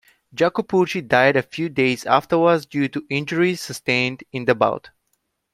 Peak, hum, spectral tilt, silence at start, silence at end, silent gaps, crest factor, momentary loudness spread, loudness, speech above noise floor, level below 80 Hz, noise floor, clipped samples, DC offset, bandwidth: 0 dBFS; none; -5.5 dB/octave; 0.35 s; 0.65 s; none; 20 dB; 8 LU; -20 LUFS; 52 dB; -60 dBFS; -71 dBFS; under 0.1%; under 0.1%; 15 kHz